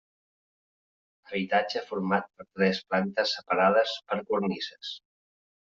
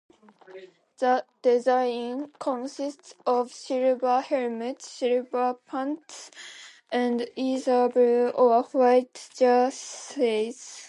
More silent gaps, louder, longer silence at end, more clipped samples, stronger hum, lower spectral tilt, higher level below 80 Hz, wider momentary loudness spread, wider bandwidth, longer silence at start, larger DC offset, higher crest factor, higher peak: neither; second, -28 LUFS vs -25 LUFS; first, 0.8 s vs 0 s; neither; neither; about the same, -3 dB/octave vs -3.5 dB/octave; first, -72 dBFS vs -84 dBFS; about the same, 13 LU vs 14 LU; second, 7.4 kHz vs 11 kHz; first, 1.3 s vs 0.5 s; neither; about the same, 20 dB vs 18 dB; about the same, -10 dBFS vs -8 dBFS